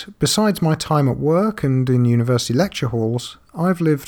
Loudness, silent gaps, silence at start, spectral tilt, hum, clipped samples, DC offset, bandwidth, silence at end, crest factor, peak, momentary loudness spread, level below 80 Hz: -18 LUFS; none; 0 s; -6 dB/octave; none; under 0.1%; under 0.1%; 18.5 kHz; 0 s; 12 dB; -6 dBFS; 6 LU; -46 dBFS